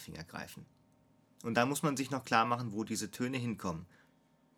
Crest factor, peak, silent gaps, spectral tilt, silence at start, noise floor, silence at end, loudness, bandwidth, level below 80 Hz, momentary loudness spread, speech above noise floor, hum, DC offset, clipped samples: 24 dB; -12 dBFS; none; -4.5 dB/octave; 0 s; -69 dBFS; 0.7 s; -35 LUFS; 18.5 kHz; -70 dBFS; 15 LU; 34 dB; none; under 0.1%; under 0.1%